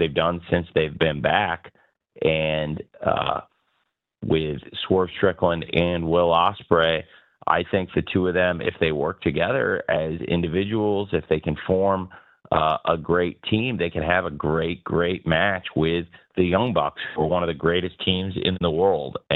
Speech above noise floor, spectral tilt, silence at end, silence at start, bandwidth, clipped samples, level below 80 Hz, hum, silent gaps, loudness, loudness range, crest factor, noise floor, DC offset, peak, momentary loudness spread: 51 dB; -9 dB/octave; 0 s; 0 s; 4.3 kHz; under 0.1%; -46 dBFS; none; none; -23 LUFS; 3 LU; 20 dB; -73 dBFS; under 0.1%; -2 dBFS; 6 LU